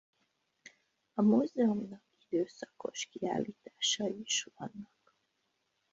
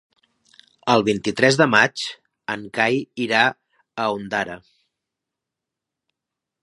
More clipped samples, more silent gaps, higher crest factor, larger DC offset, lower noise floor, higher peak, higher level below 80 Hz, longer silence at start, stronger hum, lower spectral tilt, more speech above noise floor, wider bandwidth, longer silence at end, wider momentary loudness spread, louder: neither; neither; about the same, 20 dB vs 24 dB; neither; second, -80 dBFS vs -85 dBFS; second, -16 dBFS vs 0 dBFS; second, -78 dBFS vs -62 dBFS; first, 1.15 s vs 0.85 s; neither; about the same, -3.5 dB/octave vs -4 dB/octave; second, 47 dB vs 65 dB; second, 8 kHz vs 11.5 kHz; second, 1.1 s vs 2.05 s; about the same, 17 LU vs 15 LU; second, -34 LUFS vs -20 LUFS